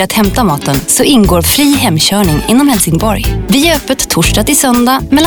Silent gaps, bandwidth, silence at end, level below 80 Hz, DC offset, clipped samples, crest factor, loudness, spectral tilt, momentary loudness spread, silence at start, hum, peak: none; over 20 kHz; 0 s; -22 dBFS; under 0.1%; under 0.1%; 8 dB; -9 LUFS; -4 dB/octave; 4 LU; 0 s; none; 0 dBFS